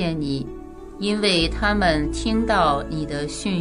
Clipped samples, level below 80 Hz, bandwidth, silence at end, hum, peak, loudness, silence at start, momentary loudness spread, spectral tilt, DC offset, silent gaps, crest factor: under 0.1%; -34 dBFS; 11 kHz; 0 s; none; -4 dBFS; -22 LUFS; 0 s; 10 LU; -5 dB/octave; under 0.1%; none; 18 dB